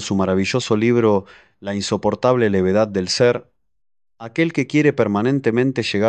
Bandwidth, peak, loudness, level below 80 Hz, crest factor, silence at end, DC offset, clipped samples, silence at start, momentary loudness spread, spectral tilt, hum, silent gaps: 9.4 kHz; -2 dBFS; -18 LUFS; -48 dBFS; 16 dB; 0 s; under 0.1%; under 0.1%; 0 s; 8 LU; -5.5 dB/octave; none; none